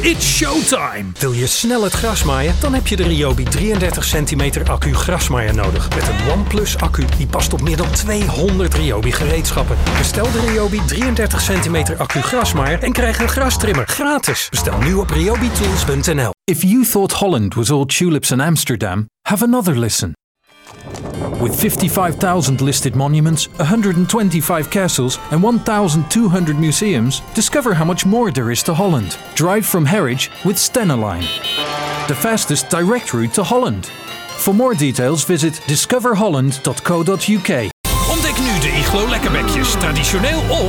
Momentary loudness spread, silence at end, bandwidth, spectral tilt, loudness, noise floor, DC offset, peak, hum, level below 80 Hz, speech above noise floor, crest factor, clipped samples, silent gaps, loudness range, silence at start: 4 LU; 0 s; 19 kHz; -4.5 dB/octave; -16 LUFS; -40 dBFS; under 0.1%; 0 dBFS; none; -24 dBFS; 25 dB; 14 dB; under 0.1%; 20.24-20.35 s, 37.73-37.84 s; 2 LU; 0 s